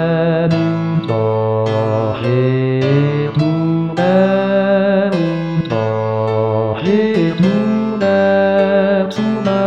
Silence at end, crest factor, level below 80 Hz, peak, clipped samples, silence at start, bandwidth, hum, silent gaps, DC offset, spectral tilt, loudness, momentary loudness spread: 0 s; 12 dB; -54 dBFS; -2 dBFS; under 0.1%; 0 s; 7.8 kHz; none; none; 0.3%; -8.5 dB/octave; -15 LUFS; 5 LU